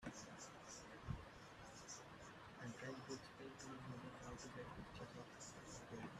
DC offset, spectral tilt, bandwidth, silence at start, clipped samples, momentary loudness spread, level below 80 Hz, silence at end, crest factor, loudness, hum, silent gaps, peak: under 0.1%; -4 dB/octave; 13.5 kHz; 0 s; under 0.1%; 5 LU; -70 dBFS; 0 s; 20 dB; -55 LUFS; none; none; -34 dBFS